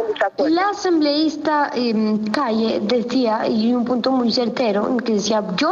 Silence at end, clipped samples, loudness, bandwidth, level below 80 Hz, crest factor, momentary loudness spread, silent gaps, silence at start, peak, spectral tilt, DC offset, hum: 0 s; under 0.1%; -19 LUFS; 7.6 kHz; -60 dBFS; 12 dB; 2 LU; none; 0 s; -6 dBFS; -5 dB/octave; under 0.1%; none